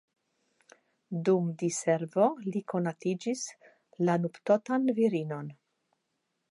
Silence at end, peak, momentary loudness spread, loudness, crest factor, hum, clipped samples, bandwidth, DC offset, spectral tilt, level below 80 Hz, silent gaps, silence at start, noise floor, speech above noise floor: 0.95 s; -12 dBFS; 11 LU; -30 LUFS; 18 dB; none; under 0.1%; 11.5 kHz; under 0.1%; -6 dB/octave; -84 dBFS; none; 1.1 s; -81 dBFS; 52 dB